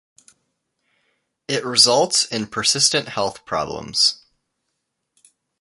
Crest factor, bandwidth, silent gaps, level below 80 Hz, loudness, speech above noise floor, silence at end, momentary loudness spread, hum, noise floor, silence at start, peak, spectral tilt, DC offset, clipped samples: 22 dB; 11.5 kHz; none; -58 dBFS; -18 LUFS; 57 dB; 1.45 s; 12 LU; none; -76 dBFS; 1.5 s; 0 dBFS; -1.5 dB/octave; under 0.1%; under 0.1%